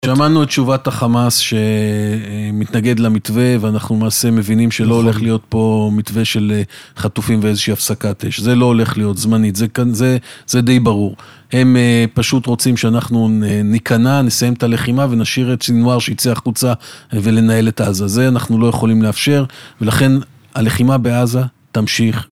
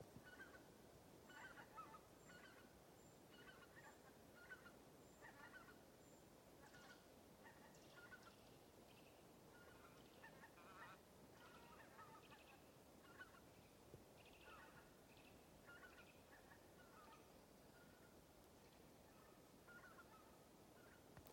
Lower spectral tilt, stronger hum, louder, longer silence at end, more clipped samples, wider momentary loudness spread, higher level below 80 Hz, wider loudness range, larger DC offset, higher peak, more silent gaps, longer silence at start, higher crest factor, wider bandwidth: first, -5.5 dB/octave vs -4 dB/octave; neither; first, -14 LUFS vs -65 LUFS; about the same, 0.05 s vs 0 s; neither; about the same, 7 LU vs 6 LU; first, -46 dBFS vs -82 dBFS; about the same, 2 LU vs 3 LU; neither; first, 0 dBFS vs -42 dBFS; neither; about the same, 0.05 s vs 0 s; second, 14 dB vs 22 dB; about the same, 16.5 kHz vs 16.5 kHz